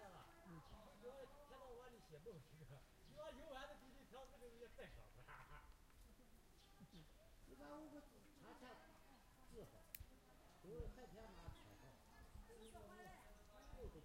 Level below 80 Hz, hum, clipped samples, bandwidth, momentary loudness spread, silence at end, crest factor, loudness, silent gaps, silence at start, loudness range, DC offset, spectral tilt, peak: -68 dBFS; none; under 0.1%; 16 kHz; 9 LU; 0 s; 30 dB; -62 LUFS; none; 0 s; 4 LU; under 0.1%; -5 dB/octave; -32 dBFS